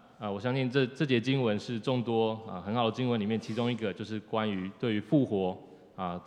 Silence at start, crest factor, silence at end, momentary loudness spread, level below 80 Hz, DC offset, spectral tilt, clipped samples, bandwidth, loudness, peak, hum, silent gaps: 0.2 s; 18 dB; 0 s; 10 LU; -78 dBFS; under 0.1%; -7 dB/octave; under 0.1%; 10 kHz; -31 LUFS; -12 dBFS; none; none